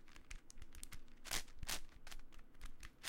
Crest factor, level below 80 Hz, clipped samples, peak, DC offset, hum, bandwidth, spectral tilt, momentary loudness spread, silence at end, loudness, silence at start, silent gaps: 24 dB; -54 dBFS; under 0.1%; -24 dBFS; under 0.1%; none; 16.5 kHz; -1 dB/octave; 16 LU; 0 s; -50 LUFS; 0 s; none